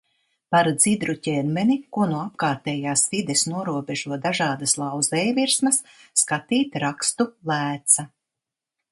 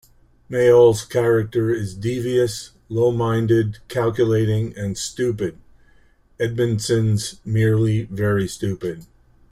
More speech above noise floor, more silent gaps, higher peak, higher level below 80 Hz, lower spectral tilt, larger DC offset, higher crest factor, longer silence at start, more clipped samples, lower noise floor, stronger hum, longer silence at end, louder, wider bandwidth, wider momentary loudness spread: first, 64 dB vs 35 dB; neither; about the same, -2 dBFS vs -4 dBFS; second, -66 dBFS vs -48 dBFS; second, -3 dB/octave vs -6.5 dB/octave; neither; first, 22 dB vs 16 dB; about the same, 0.5 s vs 0.5 s; neither; first, -86 dBFS vs -54 dBFS; neither; first, 0.85 s vs 0.45 s; about the same, -22 LUFS vs -20 LUFS; second, 12 kHz vs 15 kHz; second, 7 LU vs 10 LU